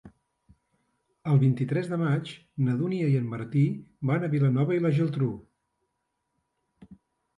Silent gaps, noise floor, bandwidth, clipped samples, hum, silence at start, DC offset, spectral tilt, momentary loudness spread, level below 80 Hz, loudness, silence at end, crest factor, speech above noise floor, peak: none; -79 dBFS; 9.4 kHz; under 0.1%; none; 0.05 s; under 0.1%; -9.5 dB/octave; 7 LU; -66 dBFS; -27 LUFS; 0.45 s; 16 dB; 54 dB; -12 dBFS